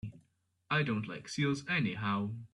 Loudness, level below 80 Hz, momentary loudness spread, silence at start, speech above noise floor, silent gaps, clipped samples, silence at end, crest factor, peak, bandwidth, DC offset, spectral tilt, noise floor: -34 LUFS; -68 dBFS; 6 LU; 0.05 s; 41 dB; none; under 0.1%; 0.05 s; 16 dB; -18 dBFS; 11 kHz; under 0.1%; -5.5 dB/octave; -75 dBFS